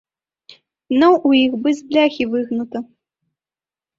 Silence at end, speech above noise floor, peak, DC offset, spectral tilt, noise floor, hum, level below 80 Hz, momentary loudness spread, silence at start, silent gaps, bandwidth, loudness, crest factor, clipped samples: 1.15 s; over 74 dB; -2 dBFS; under 0.1%; -5 dB/octave; under -90 dBFS; none; -60 dBFS; 11 LU; 0.9 s; none; 7.6 kHz; -17 LUFS; 16 dB; under 0.1%